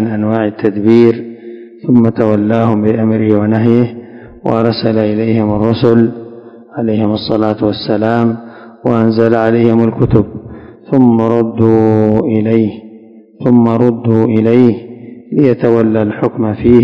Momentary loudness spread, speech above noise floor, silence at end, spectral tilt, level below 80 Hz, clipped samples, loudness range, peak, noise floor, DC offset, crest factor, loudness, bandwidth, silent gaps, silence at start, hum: 12 LU; 27 dB; 0 s; -10 dB/octave; -40 dBFS; 2%; 2 LU; 0 dBFS; -37 dBFS; 0.2%; 12 dB; -11 LUFS; 5.4 kHz; none; 0 s; none